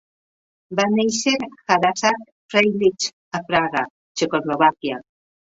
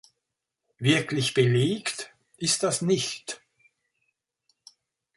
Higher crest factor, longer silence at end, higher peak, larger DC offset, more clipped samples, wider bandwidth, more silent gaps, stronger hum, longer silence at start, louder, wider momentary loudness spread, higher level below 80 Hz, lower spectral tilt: about the same, 20 dB vs 20 dB; second, 0.55 s vs 1.8 s; first, -2 dBFS vs -8 dBFS; neither; neither; second, 8 kHz vs 11.5 kHz; first, 2.32-2.49 s, 3.13-3.31 s, 3.90-4.15 s vs none; neither; about the same, 0.7 s vs 0.8 s; first, -20 LUFS vs -25 LUFS; second, 11 LU vs 15 LU; about the same, -62 dBFS vs -66 dBFS; about the same, -3.5 dB/octave vs -4 dB/octave